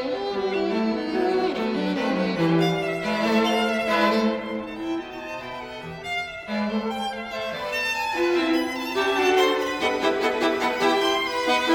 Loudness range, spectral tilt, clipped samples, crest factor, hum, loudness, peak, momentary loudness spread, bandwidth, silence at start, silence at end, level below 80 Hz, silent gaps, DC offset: 6 LU; -5 dB/octave; under 0.1%; 16 dB; none; -24 LUFS; -8 dBFS; 9 LU; 19.5 kHz; 0 s; 0 s; -56 dBFS; none; under 0.1%